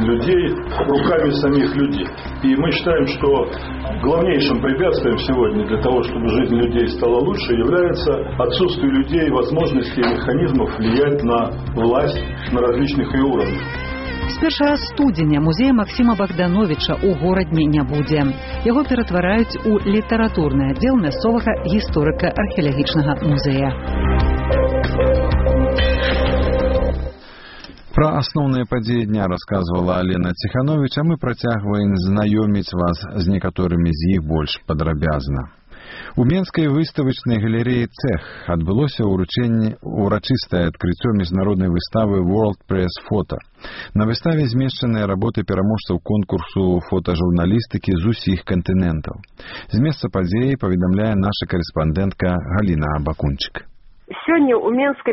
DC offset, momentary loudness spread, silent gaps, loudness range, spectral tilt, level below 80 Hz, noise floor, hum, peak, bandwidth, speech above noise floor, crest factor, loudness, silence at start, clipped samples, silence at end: under 0.1%; 6 LU; none; 3 LU; -6 dB/octave; -28 dBFS; -39 dBFS; none; -2 dBFS; 6 kHz; 21 dB; 16 dB; -18 LUFS; 0 s; under 0.1%; 0 s